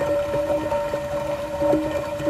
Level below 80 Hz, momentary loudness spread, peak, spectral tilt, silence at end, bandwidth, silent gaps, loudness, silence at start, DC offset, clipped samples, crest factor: -44 dBFS; 5 LU; -10 dBFS; -6 dB/octave; 0 s; 15 kHz; none; -24 LUFS; 0 s; under 0.1%; under 0.1%; 14 dB